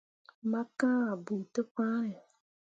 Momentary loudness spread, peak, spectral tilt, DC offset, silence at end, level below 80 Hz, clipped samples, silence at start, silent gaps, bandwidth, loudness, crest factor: 10 LU; -18 dBFS; -7 dB/octave; under 0.1%; 0.6 s; -84 dBFS; under 0.1%; 0.45 s; 1.71-1.75 s; 9.2 kHz; -33 LUFS; 16 dB